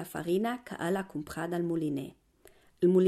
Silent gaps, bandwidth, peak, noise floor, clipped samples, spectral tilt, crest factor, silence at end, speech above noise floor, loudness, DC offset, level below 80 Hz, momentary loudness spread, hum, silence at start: none; 14.5 kHz; -14 dBFS; -61 dBFS; under 0.1%; -7 dB/octave; 16 dB; 0 s; 31 dB; -32 LUFS; under 0.1%; -66 dBFS; 8 LU; none; 0 s